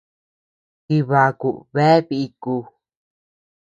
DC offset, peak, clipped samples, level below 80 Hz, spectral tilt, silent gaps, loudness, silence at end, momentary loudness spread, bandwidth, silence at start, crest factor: under 0.1%; -2 dBFS; under 0.1%; -64 dBFS; -8 dB/octave; none; -19 LUFS; 1.15 s; 11 LU; 8.8 kHz; 0.9 s; 20 dB